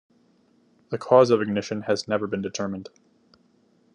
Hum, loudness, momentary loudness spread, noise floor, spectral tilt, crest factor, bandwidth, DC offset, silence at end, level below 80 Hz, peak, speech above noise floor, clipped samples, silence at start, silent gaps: none; -23 LUFS; 16 LU; -62 dBFS; -5.5 dB/octave; 22 dB; 10 kHz; under 0.1%; 1.1 s; -74 dBFS; -4 dBFS; 39 dB; under 0.1%; 0.9 s; none